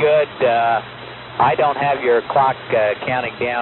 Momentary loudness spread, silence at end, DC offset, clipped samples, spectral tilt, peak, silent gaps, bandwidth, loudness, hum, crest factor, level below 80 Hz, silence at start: 7 LU; 0 s; under 0.1%; under 0.1%; -3 dB/octave; -4 dBFS; none; 4.2 kHz; -18 LUFS; none; 14 dB; -54 dBFS; 0 s